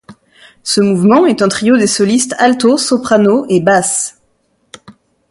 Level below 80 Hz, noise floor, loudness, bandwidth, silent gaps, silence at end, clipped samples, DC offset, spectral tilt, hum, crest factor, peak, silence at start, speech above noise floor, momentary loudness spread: -54 dBFS; -59 dBFS; -11 LUFS; 11.5 kHz; none; 0.4 s; under 0.1%; under 0.1%; -4 dB/octave; none; 12 dB; 0 dBFS; 0.1 s; 48 dB; 6 LU